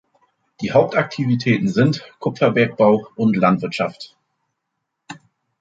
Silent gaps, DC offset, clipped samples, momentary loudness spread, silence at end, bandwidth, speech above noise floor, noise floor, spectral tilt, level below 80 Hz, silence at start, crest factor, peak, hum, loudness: none; under 0.1%; under 0.1%; 22 LU; 0.45 s; 7.8 kHz; 59 dB; -77 dBFS; -7.5 dB/octave; -58 dBFS; 0.6 s; 18 dB; -2 dBFS; none; -18 LUFS